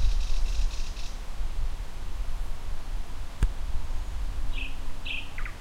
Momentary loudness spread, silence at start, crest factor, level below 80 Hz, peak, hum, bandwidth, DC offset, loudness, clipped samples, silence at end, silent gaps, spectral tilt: 7 LU; 0 s; 14 dB; -28 dBFS; -12 dBFS; none; 10.5 kHz; under 0.1%; -36 LUFS; under 0.1%; 0 s; none; -4 dB/octave